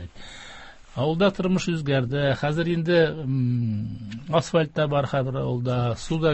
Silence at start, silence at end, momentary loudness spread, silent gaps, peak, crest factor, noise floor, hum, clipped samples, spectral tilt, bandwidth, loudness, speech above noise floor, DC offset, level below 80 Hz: 0 s; 0 s; 16 LU; none; -8 dBFS; 16 dB; -43 dBFS; none; under 0.1%; -6.5 dB/octave; 8.6 kHz; -24 LUFS; 20 dB; under 0.1%; -50 dBFS